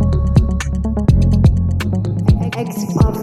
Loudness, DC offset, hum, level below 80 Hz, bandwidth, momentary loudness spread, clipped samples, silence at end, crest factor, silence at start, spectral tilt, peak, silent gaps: -16 LUFS; under 0.1%; none; -20 dBFS; 13.5 kHz; 7 LU; under 0.1%; 0 s; 14 dB; 0 s; -7.5 dB/octave; 0 dBFS; none